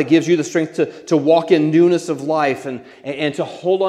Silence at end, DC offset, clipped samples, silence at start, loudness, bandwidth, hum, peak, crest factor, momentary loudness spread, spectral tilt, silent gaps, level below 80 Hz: 0 s; under 0.1%; under 0.1%; 0 s; -17 LUFS; 11 kHz; none; 0 dBFS; 16 dB; 11 LU; -6 dB/octave; none; -70 dBFS